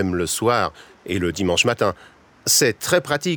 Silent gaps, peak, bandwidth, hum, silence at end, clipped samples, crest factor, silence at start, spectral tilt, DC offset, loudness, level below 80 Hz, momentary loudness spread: none; -4 dBFS; over 20 kHz; none; 0 s; under 0.1%; 18 dB; 0 s; -3 dB/octave; under 0.1%; -20 LUFS; -50 dBFS; 11 LU